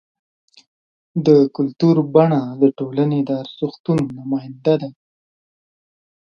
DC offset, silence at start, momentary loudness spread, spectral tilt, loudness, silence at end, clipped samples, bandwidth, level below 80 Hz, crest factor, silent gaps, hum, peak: under 0.1%; 1.15 s; 11 LU; -9 dB/octave; -18 LUFS; 1.3 s; under 0.1%; 7 kHz; -62 dBFS; 18 dB; 3.80-3.84 s; none; 0 dBFS